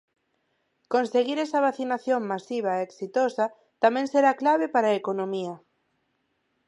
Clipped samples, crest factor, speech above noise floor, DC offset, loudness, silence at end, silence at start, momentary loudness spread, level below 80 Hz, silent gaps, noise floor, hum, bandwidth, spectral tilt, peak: under 0.1%; 20 dB; 49 dB; under 0.1%; -25 LUFS; 1.1 s; 0.9 s; 8 LU; -82 dBFS; none; -74 dBFS; none; 10.5 kHz; -5.5 dB/octave; -6 dBFS